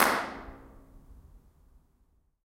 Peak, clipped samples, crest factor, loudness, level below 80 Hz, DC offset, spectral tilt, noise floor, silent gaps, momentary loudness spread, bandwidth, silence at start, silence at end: -6 dBFS; under 0.1%; 28 dB; -31 LUFS; -56 dBFS; under 0.1%; -2 dB/octave; -68 dBFS; none; 27 LU; 16 kHz; 0 s; 1.05 s